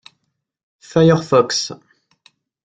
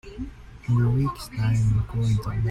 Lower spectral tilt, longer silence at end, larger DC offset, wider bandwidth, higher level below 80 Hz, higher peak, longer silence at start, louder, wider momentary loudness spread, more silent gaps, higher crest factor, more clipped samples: second, -5.5 dB/octave vs -7.5 dB/octave; first, 0.9 s vs 0 s; neither; second, 9.2 kHz vs 12.5 kHz; second, -56 dBFS vs -38 dBFS; first, -2 dBFS vs -12 dBFS; first, 0.95 s vs 0.05 s; first, -16 LUFS vs -24 LUFS; second, 9 LU vs 16 LU; neither; first, 18 dB vs 12 dB; neither